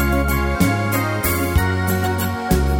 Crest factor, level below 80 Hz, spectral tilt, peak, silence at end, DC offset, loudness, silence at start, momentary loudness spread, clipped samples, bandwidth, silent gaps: 14 dB; -24 dBFS; -5.5 dB/octave; -4 dBFS; 0 s; under 0.1%; -19 LUFS; 0 s; 2 LU; under 0.1%; 17.5 kHz; none